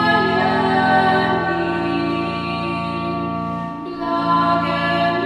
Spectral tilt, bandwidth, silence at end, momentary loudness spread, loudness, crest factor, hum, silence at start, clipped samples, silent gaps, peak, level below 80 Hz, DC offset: -7 dB/octave; 11.5 kHz; 0 s; 9 LU; -19 LUFS; 16 dB; none; 0 s; under 0.1%; none; -2 dBFS; -48 dBFS; under 0.1%